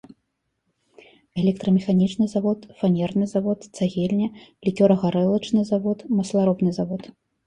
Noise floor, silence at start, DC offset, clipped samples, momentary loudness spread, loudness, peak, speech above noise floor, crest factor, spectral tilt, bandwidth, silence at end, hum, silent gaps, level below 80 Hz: -75 dBFS; 1.35 s; under 0.1%; under 0.1%; 9 LU; -22 LUFS; -4 dBFS; 54 dB; 18 dB; -8 dB/octave; 9.8 kHz; 0.4 s; none; none; -60 dBFS